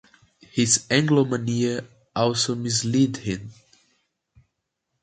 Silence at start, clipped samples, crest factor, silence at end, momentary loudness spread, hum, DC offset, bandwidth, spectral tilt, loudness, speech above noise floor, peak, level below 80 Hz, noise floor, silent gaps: 0.55 s; under 0.1%; 20 dB; 1.5 s; 13 LU; none; under 0.1%; 9.4 kHz; -4 dB/octave; -23 LUFS; 56 dB; -4 dBFS; -58 dBFS; -79 dBFS; none